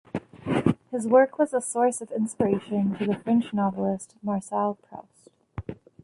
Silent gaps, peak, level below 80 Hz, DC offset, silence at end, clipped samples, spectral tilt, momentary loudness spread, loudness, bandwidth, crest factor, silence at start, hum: none; -6 dBFS; -56 dBFS; under 0.1%; 0.3 s; under 0.1%; -6.5 dB/octave; 18 LU; -25 LUFS; 11.5 kHz; 20 dB; 0.15 s; none